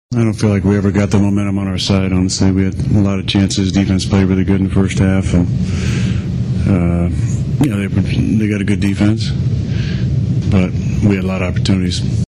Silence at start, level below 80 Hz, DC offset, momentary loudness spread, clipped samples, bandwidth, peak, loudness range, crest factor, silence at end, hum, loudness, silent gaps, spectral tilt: 0.1 s; -30 dBFS; under 0.1%; 4 LU; under 0.1%; 11.5 kHz; -4 dBFS; 2 LU; 10 dB; 0.05 s; none; -15 LUFS; none; -6.5 dB/octave